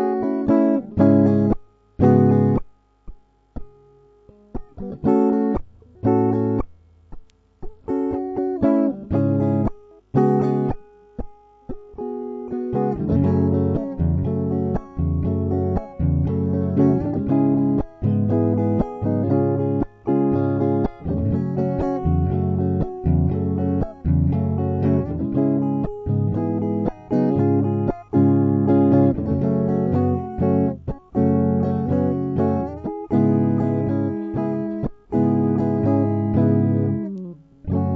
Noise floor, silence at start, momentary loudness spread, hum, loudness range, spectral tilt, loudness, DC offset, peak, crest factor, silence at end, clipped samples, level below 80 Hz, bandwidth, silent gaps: -52 dBFS; 0 s; 10 LU; none; 5 LU; -12 dB/octave; -21 LUFS; under 0.1%; -2 dBFS; 18 dB; 0 s; under 0.1%; -38 dBFS; 4.6 kHz; none